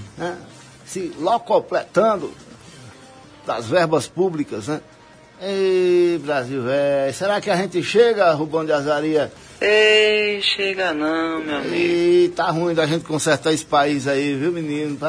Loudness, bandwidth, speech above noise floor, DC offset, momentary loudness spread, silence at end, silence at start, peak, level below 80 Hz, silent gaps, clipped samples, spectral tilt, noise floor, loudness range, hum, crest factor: -19 LUFS; 11 kHz; 27 dB; under 0.1%; 12 LU; 0 s; 0 s; -4 dBFS; -58 dBFS; none; under 0.1%; -4.5 dB/octave; -46 dBFS; 6 LU; none; 16 dB